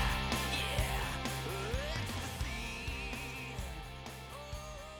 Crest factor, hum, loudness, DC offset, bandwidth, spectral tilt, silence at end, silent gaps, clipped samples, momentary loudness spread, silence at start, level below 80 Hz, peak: 18 dB; none; -38 LUFS; under 0.1%; over 20 kHz; -4 dB/octave; 0 s; none; under 0.1%; 12 LU; 0 s; -44 dBFS; -20 dBFS